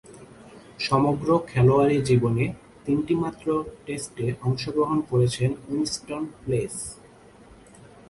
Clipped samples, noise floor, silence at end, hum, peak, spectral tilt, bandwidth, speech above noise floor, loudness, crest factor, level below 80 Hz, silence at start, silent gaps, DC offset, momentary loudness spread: under 0.1%; -50 dBFS; 1.15 s; none; -8 dBFS; -6.5 dB/octave; 11.5 kHz; 27 dB; -24 LUFS; 18 dB; -52 dBFS; 0.1 s; none; under 0.1%; 13 LU